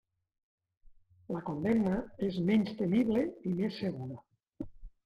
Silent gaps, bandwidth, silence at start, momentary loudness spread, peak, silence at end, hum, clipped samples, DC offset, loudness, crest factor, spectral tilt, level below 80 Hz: none; 7.2 kHz; 0.9 s; 18 LU; -18 dBFS; 0.15 s; none; under 0.1%; under 0.1%; -32 LUFS; 16 dB; -8.5 dB/octave; -58 dBFS